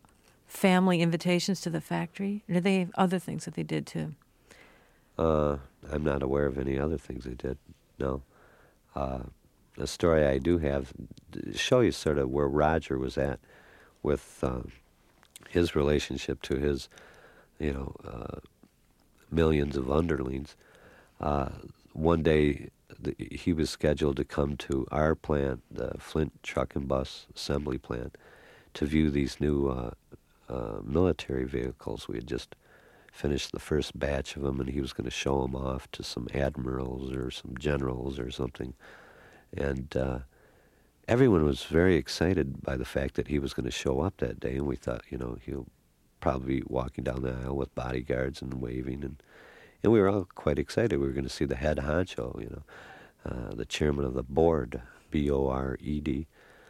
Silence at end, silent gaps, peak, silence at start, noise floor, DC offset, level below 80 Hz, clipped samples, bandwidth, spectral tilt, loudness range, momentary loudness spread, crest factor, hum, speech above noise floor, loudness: 0.45 s; none; -10 dBFS; 0.5 s; -65 dBFS; under 0.1%; -42 dBFS; under 0.1%; 16 kHz; -6.5 dB/octave; 6 LU; 14 LU; 22 dB; none; 35 dB; -30 LUFS